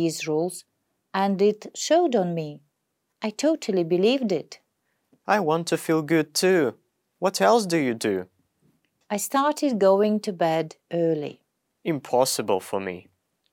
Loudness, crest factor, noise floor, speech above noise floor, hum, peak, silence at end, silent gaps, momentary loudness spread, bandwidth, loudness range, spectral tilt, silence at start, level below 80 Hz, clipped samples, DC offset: -24 LUFS; 18 dB; -77 dBFS; 54 dB; none; -6 dBFS; 0.5 s; none; 12 LU; 19 kHz; 3 LU; -4.5 dB/octave; 0 s; -78 dBFS; under 0.1%; under 0.1%